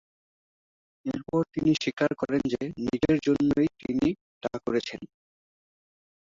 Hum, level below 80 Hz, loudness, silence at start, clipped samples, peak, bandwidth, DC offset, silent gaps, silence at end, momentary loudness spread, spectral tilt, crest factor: none; -56 dBFS; -27 LUFS; 1.05 s; under 0.1%; -10 dBFS; 7.6 kHz; under 0.1%; 1.93-1.97 s, 4.21-4.41 s; 1.3 s; 11 LU; -6.5 dB/octave; 18 dB